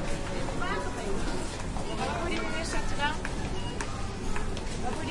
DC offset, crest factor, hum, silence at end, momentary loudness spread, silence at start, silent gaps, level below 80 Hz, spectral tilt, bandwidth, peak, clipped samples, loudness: under 0.1%; 16 dB; none; 0 s; 5 LU; 0 s; none; -36 dBFS; -4.5 dB/octave; 11.5 kHz; -14 dBFS; under 0.1%; -33 LUFS